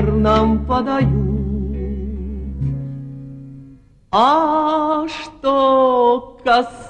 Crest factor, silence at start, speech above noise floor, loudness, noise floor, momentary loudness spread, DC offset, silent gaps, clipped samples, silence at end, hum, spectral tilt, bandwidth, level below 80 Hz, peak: 16 dB; 0 s; 28 dB; -17 LUFS; -44 dBFS; 16 LU; under 0.1%; none; under 0.1%; 0 s; none; -7.5 dB/octave; 9.4 kHz; -30 dBFS; -2 dBFS